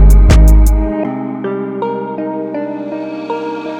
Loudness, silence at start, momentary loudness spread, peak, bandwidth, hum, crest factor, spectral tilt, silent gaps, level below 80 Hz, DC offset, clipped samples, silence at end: -15 LUFS; 0 s; 13 LU; 0 dBFS; 14 kHz; none; 10 dB; -7.5 dB/octave; none; -12 dBFS; under 0.1%; under 0.1%; 0 s